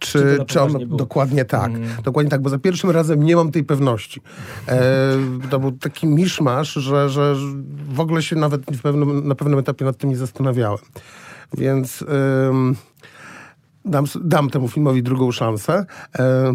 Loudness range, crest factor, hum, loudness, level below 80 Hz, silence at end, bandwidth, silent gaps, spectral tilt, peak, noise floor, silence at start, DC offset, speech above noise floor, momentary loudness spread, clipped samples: 3 LU; 16 dB; none; -19 LUFS; -60 dBFS; 0 s; 15.5 kHz; none; -7 dB/octave; -2 dBFS; -45 dBFS; 0 s; under 0.1%; 27 dB; 11 LU; under 0.1%